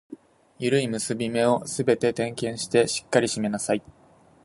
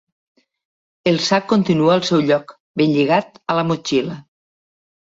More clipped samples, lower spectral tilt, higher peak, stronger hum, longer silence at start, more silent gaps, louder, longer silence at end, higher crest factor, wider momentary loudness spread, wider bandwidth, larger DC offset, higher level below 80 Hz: neither; about the same, -4.5 dB/octave vs -5.5 dB/octave; about the same, -4 dBFS vs -2 dBFS; neither; second, 0.1 s vs 1.05 s; second, none vs 2.60-2.74 s; second, -25 LUFS vs -17 LUFS; second, 0.65 s vs 0.95 s; about the same, 20 dB vs 18 dB; about the same, 6 LU vs 8 LU; first, 11.5 kHz vs 7.8 kHz; neither; about the same, -62 dBFS vs -60 dBFS